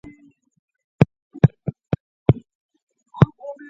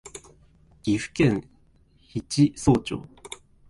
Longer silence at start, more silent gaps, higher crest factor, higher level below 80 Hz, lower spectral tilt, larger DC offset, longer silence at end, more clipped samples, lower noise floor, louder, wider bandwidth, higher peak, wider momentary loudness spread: first, 1 s vs 0.05 s; first, 1.22-1.30 s, 2.00-2.26 s, 2.55-2.69 s, 2.83-2.87 s vs none; about the same, 22 dB vs 18 dB; about the same, -44 dBFS vs -48 dBFS; first, -10 dB/octave vs -6 dB/octave; neither; second, 0.2 s vs 0.35 s; neither; second, -52 dBFS vs -59 dBFS; first, -21 LUFS vs -25 LUFS; second, 6 kHz vs 11.5 kHz; first, 0 dBFS vs -8 dBFS; second, 10 LU vs 20 LU